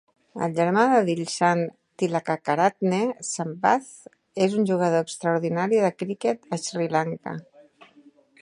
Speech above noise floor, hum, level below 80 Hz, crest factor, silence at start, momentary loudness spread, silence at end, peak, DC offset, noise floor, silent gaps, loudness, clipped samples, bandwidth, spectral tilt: 32 dB; none; -74 dBFS; 20 dB; 0.35 s; 9 LU; 1 s; -4 dBFS; under 0.1%; -55 dBFS; none; -24 LUFS; under 0.1%; 11.5 kHz; -5.5 dB/octave